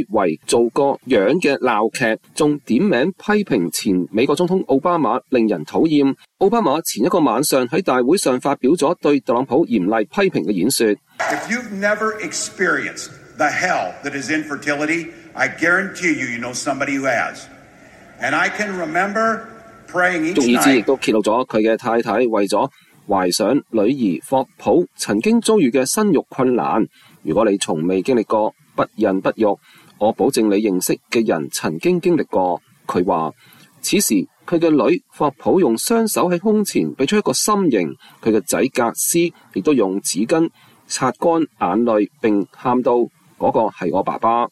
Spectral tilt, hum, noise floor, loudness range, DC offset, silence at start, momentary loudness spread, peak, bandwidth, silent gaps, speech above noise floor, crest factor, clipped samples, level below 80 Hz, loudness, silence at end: -4.5 dB/octave; none; -44 dBFS; 3 LU; under 0.1%; 0 s; 6 LU; 0 dBFS; 14.5 kHz; none; 27 dB; 16 dB; under 0.1%; -58 dBFS; -18 LUFS; 0.05 s